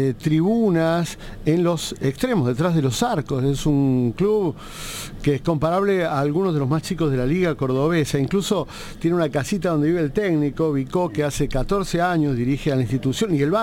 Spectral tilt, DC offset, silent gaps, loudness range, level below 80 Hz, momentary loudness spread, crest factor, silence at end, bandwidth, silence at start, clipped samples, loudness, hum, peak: -6.5 dB/octave; under 0.1%; none; 1 LU; -38 dBFS; 5 LU; 14 dB; 0 s; 17 kHz; 0 s; under 0.1%; -21 LUFS; none; -6 dBFS